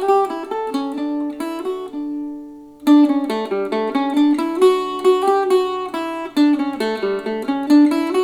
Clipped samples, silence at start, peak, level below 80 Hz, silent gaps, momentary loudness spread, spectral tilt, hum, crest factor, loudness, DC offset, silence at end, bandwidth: under 0.1%; 0 s; -2 dBFS; -62 dBFS; none; 12 LU; -5 dB/octave; none; 14 dB; -18 LUFS; under 0.1%; 0 s; 13.5 kHz